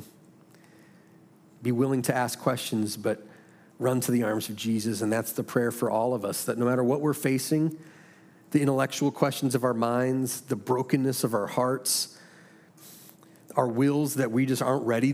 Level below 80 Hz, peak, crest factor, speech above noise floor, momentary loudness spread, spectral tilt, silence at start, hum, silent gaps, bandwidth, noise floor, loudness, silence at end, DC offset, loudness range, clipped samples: -76 dBFS; -8 dBFS; 20 dB; 29 dB; 6 LU; -5 dB/octave; 0 s; none; none; 16.5 kHz; -56 dBFS; -27 LUFS; 0 s; under 0.1%; 3 LU; under 0.1%